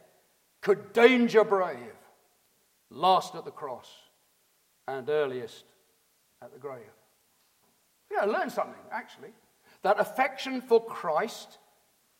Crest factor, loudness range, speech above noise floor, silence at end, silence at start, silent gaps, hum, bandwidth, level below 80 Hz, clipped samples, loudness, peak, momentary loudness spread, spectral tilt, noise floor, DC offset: 26 dB; 11 LU; 41 dB; 0.75 s; 0.65 s; none; none; 16.5 kHz; -84 dBFS; under 0.1%; -27 LUFS; -4 dBFS; 22 LU; -4.5 dB/octave; -69 dBFS; under 0.1%